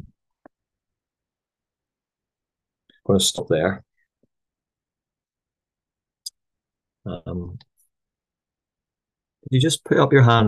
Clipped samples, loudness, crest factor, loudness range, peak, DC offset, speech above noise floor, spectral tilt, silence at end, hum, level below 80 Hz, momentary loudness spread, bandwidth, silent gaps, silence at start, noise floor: under 0.1%; -20 LUFS; 24 dB; 15 LU; 0 dBFS; under 0.1%; 72 dB; -5 dB/octave; 0 s; none; -52 dBFS; 22 LU; 12.5 kHz; none; 3.1 s; -90 dBFS